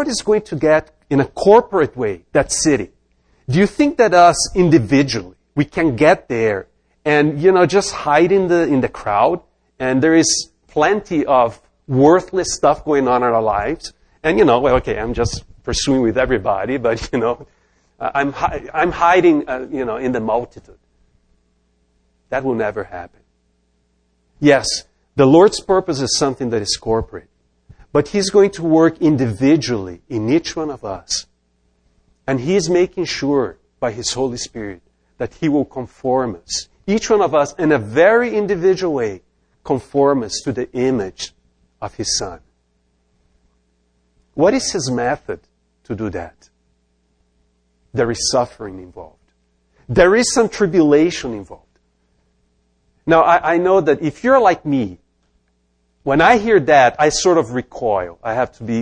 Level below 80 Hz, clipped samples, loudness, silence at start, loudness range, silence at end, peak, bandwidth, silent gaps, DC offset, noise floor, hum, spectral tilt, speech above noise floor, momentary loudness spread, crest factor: -42 dBFS; under 0.1%; -16 LUFS; 0 s; 9 LU; 0 s; 0 dBFS; 10.5 kHz; none; under 0.1%; -63 dBFS; none; -4.5 dB/octave; 48 dB; 14 LU; 18 dB